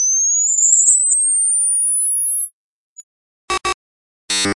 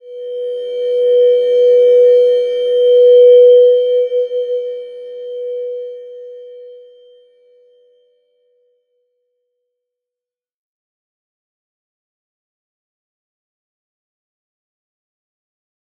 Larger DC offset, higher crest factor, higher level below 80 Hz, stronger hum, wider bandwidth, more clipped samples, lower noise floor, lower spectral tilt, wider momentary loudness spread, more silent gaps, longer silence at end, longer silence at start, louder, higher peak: neither; about the same, 18 dB vs 14 dB; first, -52 dBFS vs -86 dBFS; neither; first, 11.5 kHz vs 4.5 kHz; neither; about the same, under -90 dBFS vs -89 dBFS; second, 0.5 dB/octave vs -2.5 dB/octave; second, 14 LU vs 22 LU; first, 2.53-2.96 s, 3.03-3.48 s, 3.74-4.28 s vs none; second, 0.05 s vs 9.25 s; about the same, 0 s vs 0.05 s; about the same, -13 LUFS vs -11 LUFS; about the same, 0 dBFS vs -2 dBFS